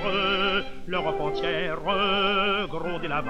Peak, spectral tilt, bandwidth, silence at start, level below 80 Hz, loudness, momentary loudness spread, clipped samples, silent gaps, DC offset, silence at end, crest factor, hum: -12 dBFS; -5.5 dB/octave; 9 kHz; 0 s; -44 dBFS; -25 LUFS; 7 LU; under 0.1%; none; under 0.1%; 0 s; 14 dB; none